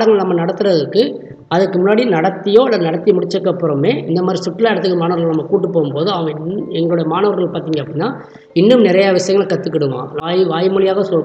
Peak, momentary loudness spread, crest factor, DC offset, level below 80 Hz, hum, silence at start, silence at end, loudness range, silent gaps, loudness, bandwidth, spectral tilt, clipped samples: 0 dBFS; 9 LU; 14 dB; under 0.1%; -60 dBFS; none; 0 s; 0 s; 2 LU; none; -15 LUFS; 8.4 kHz; -6.5 dB/octave; under 0.1%